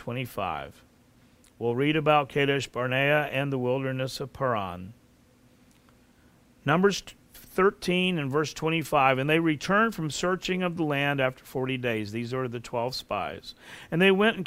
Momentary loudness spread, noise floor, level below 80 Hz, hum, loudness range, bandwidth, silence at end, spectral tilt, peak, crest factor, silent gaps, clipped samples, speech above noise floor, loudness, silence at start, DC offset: 11 LU; -59 dBFS; -58 dBFS; none; 6 LU; 16 kHz; 0 s; -5.5 dB/octave; -6 dBFS; 20 dB; none; under 0.1%; 33 dB; -27 LUFS; 0 s; under 0.1%